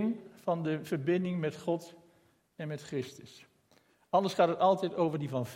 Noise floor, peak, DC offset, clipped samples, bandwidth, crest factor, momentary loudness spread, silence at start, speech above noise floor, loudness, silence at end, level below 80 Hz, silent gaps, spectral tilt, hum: -68 dBFS; -12 dBFS; under 0.1%; under 0.1%; 16.5 kHz; 20 dB; 14 LU; 0 s; 36 dB; -32 LUFS; 0 s; -78 dBFS; none; -7 dB/octave; none